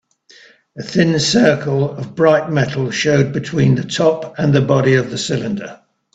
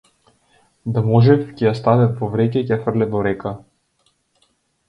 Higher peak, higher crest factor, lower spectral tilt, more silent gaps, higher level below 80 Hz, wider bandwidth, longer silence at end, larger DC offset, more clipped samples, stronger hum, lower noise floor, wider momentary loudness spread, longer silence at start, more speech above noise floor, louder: about the same, 0 dBFS vs 0 dBFS; about the same, 16 dB vs 18 dB; second, -5.5 dB/octave vs -9.5 dB/octave; neither; about the same, -50 dBFS vs -50 dBFS; first, 8.4 kHz vs 5.6 kHz; second, 0.4 s vs 1.3 s; neither; neither; neither; second, -47 dBFS vs -64 dBFS; second, 8 LU vs 13 LU; about the same, 0.75 s vs 0.85 s; second, 32 dB vs 48 dB; about the same, -16 LUFS vs -18 LUFS